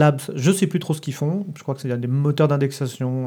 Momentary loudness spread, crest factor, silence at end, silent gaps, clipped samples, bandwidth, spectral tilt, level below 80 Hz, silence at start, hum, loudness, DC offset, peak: 8 LU; 18 dB; 0 s; none; under 0.1%; 17.5 kHz; -6.5 dB/octave; -72 dBFS; 0 s; none; -22 LUFS; under 0.1%; -4 dBFS